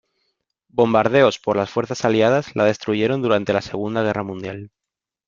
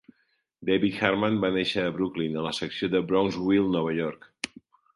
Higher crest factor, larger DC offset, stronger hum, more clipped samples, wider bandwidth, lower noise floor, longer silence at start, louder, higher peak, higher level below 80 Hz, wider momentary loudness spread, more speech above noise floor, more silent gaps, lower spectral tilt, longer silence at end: about the same, 20 dB vs 22 dB; neither; neither; neither; second, 7.6 kHz vs 11.5 kHz; first, -86 dBFS vs -72 dBFS; first, 0.75 s vs 0.6 s; first, -19 LUFS vs -27 LUFS; first, 0 dBFS vs -4 dBFS; about the same, -58 dBFS vs -58 dBFS; about the same, 12 LU vs 12 LU; first, 67 dB vs 46 dB; neither; about the same, -6 dB/octave vs -6 dB/octave; about the same, 0.6 s vs 0.5 s